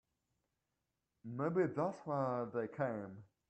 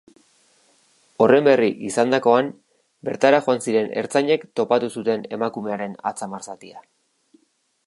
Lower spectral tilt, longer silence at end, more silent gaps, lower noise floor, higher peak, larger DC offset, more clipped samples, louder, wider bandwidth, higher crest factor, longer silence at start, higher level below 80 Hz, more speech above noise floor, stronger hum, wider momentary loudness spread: first, -9 dB/octave vs -5 dB/octave; second, 0.25 s vs 1.05 s; neither; first, -88 dBFS vs -67 dBFS; second, -24 dBFS vs -2 dBFS; neither; neither; second, -39 LUFS vs -20 LUFS; second, 8.6 kHz vs 11.5 kHz; about the same, 18 dB vs 20 dB; about the same, 1.25 s vs 1.2 s; second, -80 dBFS vs -72 dBFS; about the same, 49 dB vs 47 dB; neither; about the same, 13 LU vs 15 LU